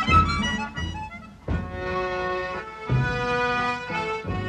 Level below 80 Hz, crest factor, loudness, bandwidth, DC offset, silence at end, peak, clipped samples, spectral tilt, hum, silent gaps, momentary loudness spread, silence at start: -38 dBFS; 20 dB; -26 LUFS; 9.8 kHz; under 0.1%; 0 s; -6 dBFS; under 0.1%; -5.5 dB/octave; none; none; 9 LU; 0 s